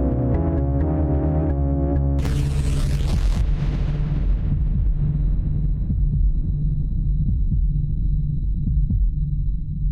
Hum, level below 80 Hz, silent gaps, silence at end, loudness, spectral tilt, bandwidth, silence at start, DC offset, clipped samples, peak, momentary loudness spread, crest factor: none; -22 dBFS; none; 0 s; -23 LUFS; -8.5 dB/octave; 9.6 kHz; 0 s; under 0.1%; under 0.1%; -10 dBFS; 3 LU; 8 dB